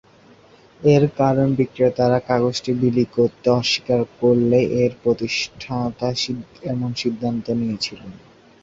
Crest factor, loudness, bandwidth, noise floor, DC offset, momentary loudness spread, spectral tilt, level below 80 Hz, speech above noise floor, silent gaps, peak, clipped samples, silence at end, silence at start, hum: 18 dB; -20 LUFS; 7.8 kHz; -50 dBFS; under 0.1%; 9 LU; -6 dB/octave; -52 dBFS; 30 dB; none; -2 dBFS; under 0.1%; 0.45 s; 0.8 s; none